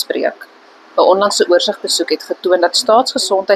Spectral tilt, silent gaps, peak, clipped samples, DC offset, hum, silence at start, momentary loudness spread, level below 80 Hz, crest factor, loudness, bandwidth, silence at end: -1.5 dB/octave; none; 0 dBFS; under 0.1%; under 0.1%; none; 0 s; 7 LU; -64 dBFS; 14 dB; -14 LUFS; 14 kHz; 0 s